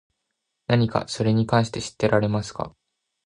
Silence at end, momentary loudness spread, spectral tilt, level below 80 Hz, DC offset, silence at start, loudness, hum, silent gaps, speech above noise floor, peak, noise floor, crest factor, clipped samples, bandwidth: 0.55 s; 13 LU; -6 dB/octave; -52 dBFS; under 0.1%; 0.7 s; -23 LUFS; none; none; 57 dB; -4 dBFS; -79 dBFS; 20 dB; under 0.1%; 10.5 kHz